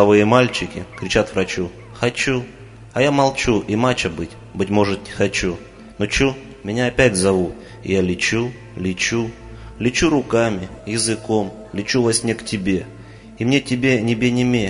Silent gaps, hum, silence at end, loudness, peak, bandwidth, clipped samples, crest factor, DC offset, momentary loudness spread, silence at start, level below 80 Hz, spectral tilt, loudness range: none; none; 0 s; -19 LUFS; 0 dBFS; 11 kHz; under 0.1%; 20 dB; under 0.1%; 12 LU; 0 s; -40 dBFS; -4.5 dB/octave; 1 LU